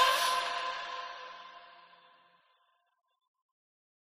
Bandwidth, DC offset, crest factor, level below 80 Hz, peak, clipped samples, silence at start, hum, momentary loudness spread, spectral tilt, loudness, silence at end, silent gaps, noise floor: 14 kHz; under 0.1%; 24 dB; -76 dBFS; -14 dBFS; under 0.1%; 0 s; none; 24 LU; 1.5 dB/octave; -32 LUFS; 2.2 s; none; -74 dBFS